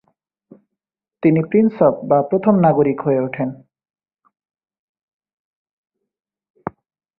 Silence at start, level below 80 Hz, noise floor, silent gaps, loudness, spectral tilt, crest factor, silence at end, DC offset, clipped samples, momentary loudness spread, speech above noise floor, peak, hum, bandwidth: 1.25 s; -60 dBFS; -83 dBFS; 4.79-4.95 s, 5.03-5.20 s, 5.33-5.65 s, 5.71-5.84 s, 6.50-6.54 s; -17 LUFS; -13.5 dB/octave; 18 dB; 0.5 s; under 0.1%; under 0.1%; 19 LU; 67 dB; -2 dBFS; none; 4.1 kHz